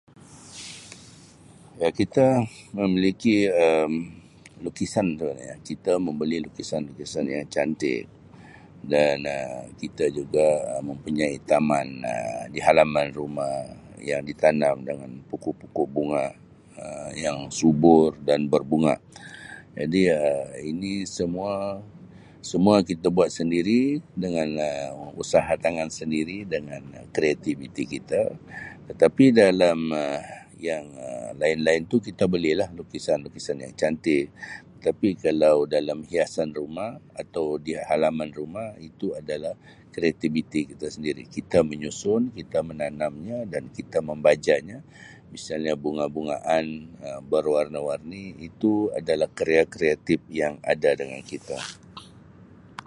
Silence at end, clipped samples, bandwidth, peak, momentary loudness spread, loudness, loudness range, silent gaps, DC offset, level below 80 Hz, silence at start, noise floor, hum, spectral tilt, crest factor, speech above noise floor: 0.05 s; under 0.1%; 11.5 kHz; -2 dBFS; 17 LU; -25 LUFS; 6 LU; none; under 0.1%; -56 dBFS; 0.3 s; -50 dBFS; none; -5.5 dB/octave; 22 dB; 26 dB